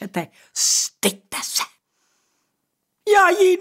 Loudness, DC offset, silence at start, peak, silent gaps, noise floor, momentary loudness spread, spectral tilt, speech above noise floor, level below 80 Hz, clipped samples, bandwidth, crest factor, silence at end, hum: -19 LUFS; under 0.1%; 0 s; -4 dBFS; none; -75 dBFS; 15 LU; -1.5 dB/octave; 56 dB; -68 dBFS; under 0.1%; 16 kHz; 16 dB; 0 s; none